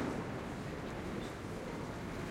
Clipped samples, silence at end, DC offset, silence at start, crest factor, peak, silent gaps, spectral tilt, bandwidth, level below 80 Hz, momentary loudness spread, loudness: under 0.1%; 0 s; under 0.1%; 0 s; 16 dB; -26 dBFS; none; -6 dB/octave; 16.5 kHz; -54 dBFS; 2 LU; -42 LUFS